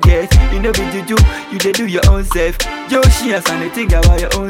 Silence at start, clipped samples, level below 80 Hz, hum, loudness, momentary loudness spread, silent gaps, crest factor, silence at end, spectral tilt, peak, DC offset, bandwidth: 0 s; under 0.1%; -14 dBFS; none; -14 LUFS; 6 LU; none; 12 dB; 0 s; -5 dB/octave; 0 dBFS; under 0.1%; 16.5 kHz